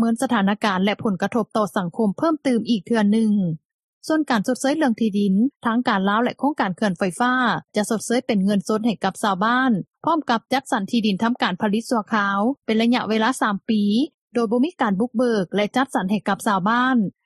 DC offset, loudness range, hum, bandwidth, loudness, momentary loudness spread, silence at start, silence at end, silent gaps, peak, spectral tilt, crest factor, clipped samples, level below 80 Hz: under 0.1%; 1 LU; none; 13 kHz; -21 LUFS; 4 LU; 0 s; 0.15 s; 3.65-4.01 s, 5.56-5.60 s, 14.14-14.28 s; -4 dBFS; -5.5 dB/octave; 16 dB; under 0.1%; -66 dBFS